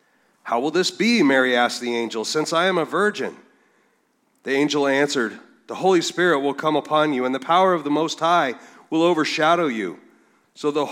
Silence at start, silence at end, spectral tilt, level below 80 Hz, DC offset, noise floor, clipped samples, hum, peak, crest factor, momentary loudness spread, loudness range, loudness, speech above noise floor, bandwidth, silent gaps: 0.45 s; 0 s; -4 dB/octave; -80 dBFS; under 0.1%; -65 dBFS; under 0.1%; none; -4 dBFS; 18 dB; 10 LU; 3 LU; -20 LUFS; 45 dB; 15 kHz; none